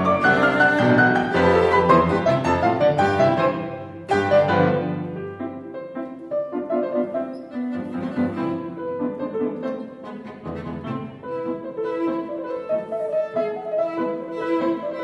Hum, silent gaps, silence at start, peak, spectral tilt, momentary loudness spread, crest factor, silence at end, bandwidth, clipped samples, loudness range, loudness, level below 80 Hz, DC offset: none; none; 0 s; -2 dBFS; -7 dB/octave; 15 LU; 20 dB; 0 s; 11.5 kHz; under 0.1%; 11 LU; -22 LUFS; -52 dBFS; under 0.1%